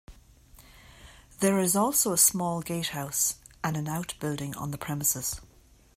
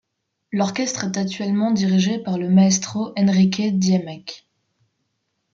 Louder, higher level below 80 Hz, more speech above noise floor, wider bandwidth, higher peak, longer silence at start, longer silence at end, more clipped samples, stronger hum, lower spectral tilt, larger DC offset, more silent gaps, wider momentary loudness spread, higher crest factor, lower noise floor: second, -27 LUFS vs -20 LUFS; first, -56 dBFS vs -64 dBFS; second, 27 dB vs 58 dB; first, 16 kHz vs 7.6 kHz; about the same, -8 dBFS vs -6 dBFS; second, 0.1 s vs 0.5 s; second, 0.5 s vs 1.15 s; neither; neither; second, -3.5 dB/octave vs -5.5 dB/octave; neither; neither; first, 13 LU vs 9 LU; first, 22 dB vs 14 dB; second, -55 dBFS vs -77 dBFS